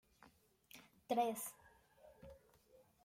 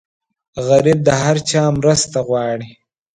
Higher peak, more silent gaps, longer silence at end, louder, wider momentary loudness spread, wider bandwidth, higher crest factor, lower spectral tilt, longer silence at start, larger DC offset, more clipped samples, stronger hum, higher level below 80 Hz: second, -26 dBFS vs 0 dBFS; neither; first, 0.7 s vs 0.45 s; second, -42 LUFS vs -15 LUFS; first, 24 LU vs 11 LU; first, 16.5 kHz vs 11 kHz; first, 22 dB vs 16 dB; second, -3.5 dB/octave vs -5 dB/octave; second, 0.25 s vs 0.55 s; neither; neither; neither; second, -78 dBFS vs -46 dBFS